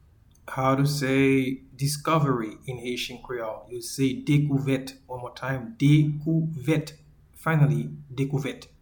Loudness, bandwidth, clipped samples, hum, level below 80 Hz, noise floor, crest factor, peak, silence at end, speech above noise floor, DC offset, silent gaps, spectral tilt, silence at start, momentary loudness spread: -26 LUFS; 19 kHz; under 0.1%; none; -56 dBFS; -49 dBFS; 18 dB; -8 dBFS; 0.15 s; 24 dB; under 0.1%; none; -6.5 dB/octave; 0.45 s; 14 LU